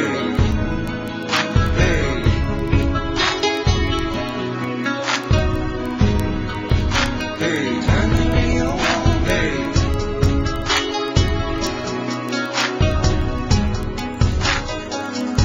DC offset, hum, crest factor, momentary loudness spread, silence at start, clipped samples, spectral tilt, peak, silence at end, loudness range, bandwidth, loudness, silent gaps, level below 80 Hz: under 0.1%; none; 16 dB; 6 LU; 0 s; under 0.1%; -5.5 dB/octave; -2 dBFS; 0 s; 2 LU; 15.5 kHz; -20 LUFS; none; -24 dBFS